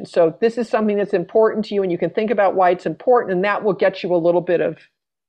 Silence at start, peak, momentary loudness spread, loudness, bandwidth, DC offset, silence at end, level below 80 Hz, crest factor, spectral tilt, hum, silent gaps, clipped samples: 0 s; -6 dBFS; 4 LU; -18 LUFS; 9.2 kHz; under 0.1%; 0.55 s; -66 dBFS; 14 dB; -7.5 dB/octave; none; none; under 0.1%